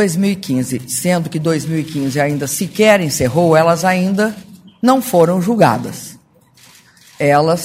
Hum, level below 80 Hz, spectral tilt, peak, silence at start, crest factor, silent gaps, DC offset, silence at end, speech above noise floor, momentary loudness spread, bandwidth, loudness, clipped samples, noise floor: none; -50 dBFS; -5.5 dB/octave; 0 dBFS; 0 s; 14 dB; none; under 0.1%; 0 s; 34 dB; 8 LU; 16 kHz; -15 LUFS; under 0.1%; -48 dBFS